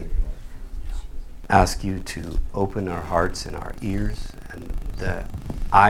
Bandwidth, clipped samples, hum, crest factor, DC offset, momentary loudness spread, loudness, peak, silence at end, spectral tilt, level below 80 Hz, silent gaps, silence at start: 15 kHz; under 0.1%; none; 22 dB; under 0.1%; 19 LU; -26 LUFS; 0 dBFS; 0 s; -5.5 dB/octave; -30 dBFS; none; 0 s